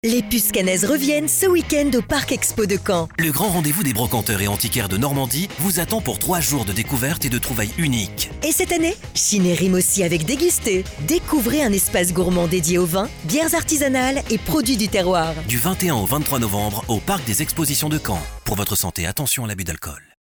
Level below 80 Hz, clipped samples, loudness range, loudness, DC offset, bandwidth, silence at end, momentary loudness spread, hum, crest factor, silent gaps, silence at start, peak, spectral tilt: -38 dBFS; under 0.1%; 2 LU; -19 LUFS; under 0.1%; over 20 kHz; 0.2 s; 5 LU; none; 12 dB; none; 0.05 s; -8 dBFS; -4 dB/octave